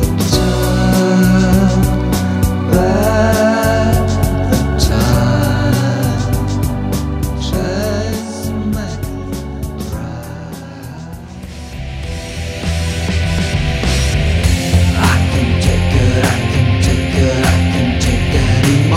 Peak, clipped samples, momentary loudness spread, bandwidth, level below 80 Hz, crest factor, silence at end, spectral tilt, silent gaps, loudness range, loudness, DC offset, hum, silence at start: 0 dBFS; under 0.1%; 12 LU; 16 kHz; -22 dBFS; 14 dB; 0 s; -6 dB/octave; none; 11 LU; -14 LUFS; under 0.1%; none; 0 s